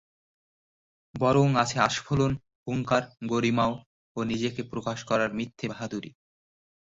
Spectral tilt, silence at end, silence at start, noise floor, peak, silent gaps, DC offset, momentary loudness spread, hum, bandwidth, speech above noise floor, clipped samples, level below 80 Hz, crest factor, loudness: -5.5 dB/octave; 0.75 s; 1.15 s; under -90 dBFS; -8 dBFS; 2.55-2.66 s, 3.86-4.15 s; under 0.1%; 12 LU; none; 7.8 kHz; over 63 dB; under 0.1%; -56 dBFS; 22 dB; -27 LUFS